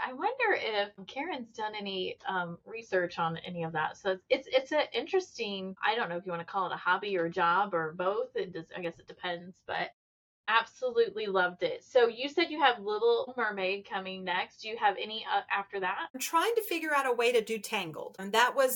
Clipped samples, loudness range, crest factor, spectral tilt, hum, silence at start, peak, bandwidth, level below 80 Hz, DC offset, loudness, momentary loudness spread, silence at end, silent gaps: under 0.1%; 4 LU; 22 dB; -3.5 dB/octave; none; 0 s; -8 dBFS; 17.5 kHz; -78 dBFS; under 0.1%; -31 LUFS; 11 LU; 0 s; 9.93-10.44 s, 16.10-16.14 s